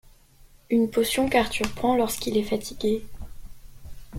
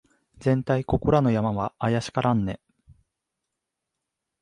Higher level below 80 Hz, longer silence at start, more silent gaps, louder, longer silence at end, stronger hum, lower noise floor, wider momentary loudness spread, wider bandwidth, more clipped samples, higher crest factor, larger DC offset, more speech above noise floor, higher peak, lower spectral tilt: about the same, -44 dBFS vs -46 dBFS; second, 0.05 s vs 0.4 s; neither; about the same, -25 LUFS vs -24 LUFS; second, 0 s vs 1.85 s; neither; second, -53 dBFS vs -84 dBFS; first, 12 LU vs 8 LU; first, 16.5 kHz vs 11 kHz; neither; about the same, 20 dB vs 20 dB; neither; second, 29 dB vs 60 dB; about the same, -6 dBFS vs -6 dBFS; second, -4 dB/octave vs -7.5 dB/octave